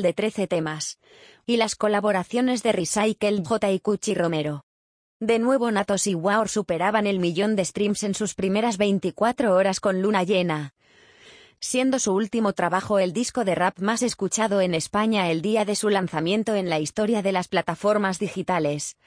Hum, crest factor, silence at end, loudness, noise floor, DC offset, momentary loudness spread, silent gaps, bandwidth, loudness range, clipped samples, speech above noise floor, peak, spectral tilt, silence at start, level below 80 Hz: none; 16 dB; 0.15 s; -23 LUFS; -52 dBFS; under 0.1%; 4 LU; 4.63-5.20 s; 10.5 kHz; 1 LU; under 0.1%; 29 dB; -8 dBFS; -4.5 dB/octave; 0 s; -60 dBFS